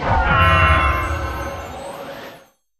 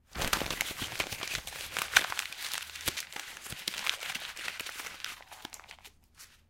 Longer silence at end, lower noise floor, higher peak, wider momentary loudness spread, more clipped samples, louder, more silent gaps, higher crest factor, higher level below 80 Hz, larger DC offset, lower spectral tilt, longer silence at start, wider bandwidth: first, 0.4 s vs 0.15 s; second, -46 dBFS vs -57 dBFS; first, 0 dBFS vs -4 dBFS; about the same, 20 LU vs 19 LU; neither; first, -16 LUFS vs -34 LUFS; neither; second, 18 dB vs 34 dB; first, -26 dBFS vs -54 dBFS; neither; first, -5.5 dB/octave vs -0.5 dB/octave; about the same, 0 s vs 0.1 s; second, 13.5 kHz vs 16.5 kHz